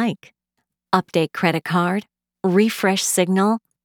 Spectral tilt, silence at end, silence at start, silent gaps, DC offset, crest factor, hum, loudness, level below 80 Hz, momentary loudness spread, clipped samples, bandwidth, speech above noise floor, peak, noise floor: -4.5 dB/octave; 0.25 s; 0 s; none; under 0.1%; 20 dB; none; -20 LUFS; -74 dBFS; 7 LU; under 0.1%; over 20 kHz; 57 dB; 0 dBFS; -77 dBFS